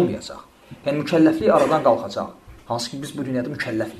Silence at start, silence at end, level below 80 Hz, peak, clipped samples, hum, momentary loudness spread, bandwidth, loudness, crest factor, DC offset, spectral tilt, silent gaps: 0 s; 0 s; -54 dBFS; -2 dBFS; under 0.1%; none; 15 LU; 13.5 kHz; -21 LUFS; 20 dB; under 0.1%; -6 dB/octave; none